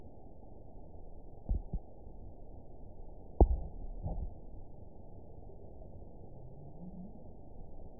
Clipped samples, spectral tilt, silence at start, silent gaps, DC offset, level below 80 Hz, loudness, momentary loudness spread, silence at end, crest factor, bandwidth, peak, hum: under 0.1%; -5.5 dB/octave; 0 s; none; 0.3%; -40 dBFS; -39 LUFS; 17 LU; 0 s; 30 dB; 1 kHz; -10 dBFS; none